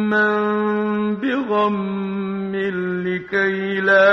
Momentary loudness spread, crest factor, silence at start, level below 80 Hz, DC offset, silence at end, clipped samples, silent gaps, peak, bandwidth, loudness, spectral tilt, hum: 7 LU; 16 dB; 0 s; -60 dBFS; under 0.1%; 0 s; under 0.1%; none; -2 dBFS; 6.2 kHz; -20 LUFS; -7.5 dB/octave; none